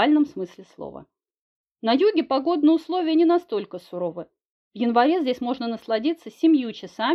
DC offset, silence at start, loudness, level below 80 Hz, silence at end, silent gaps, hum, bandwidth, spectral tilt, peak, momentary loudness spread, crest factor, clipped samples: under 0.1%; 0 s; -22 LUFS; -70 dBFS; 0 s; 1.41-1.64 s, 4.50-4.71 s; none; 6.4 kHz; -6 dB/octave; -4 dBFS; 15 LU; 18 dB; under 0.1%